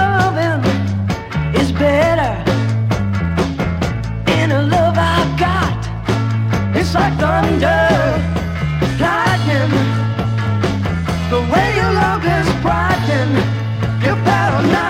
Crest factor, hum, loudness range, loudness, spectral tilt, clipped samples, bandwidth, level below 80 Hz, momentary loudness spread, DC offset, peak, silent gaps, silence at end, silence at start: 14 dB; none; 1 LU; -16 LUFS; -6.5 dB/octave; under 0.1%; 14.5 kHz; -30 dBFS; 5 LU; under 0.1%; 0 dBFS; none; 0 s; 0 s